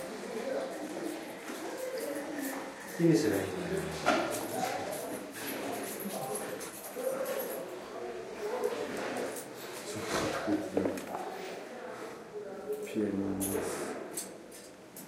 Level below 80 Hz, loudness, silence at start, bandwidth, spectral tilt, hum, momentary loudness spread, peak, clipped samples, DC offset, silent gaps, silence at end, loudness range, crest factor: -66 dBFS; -36 LUFS; 0 s; 16 kHz; -4.5 dB/octave; none; 11 LU; -12 dBFS; under 0.1%; under 0.1%; none; 0 s; 5 LU; 24 dB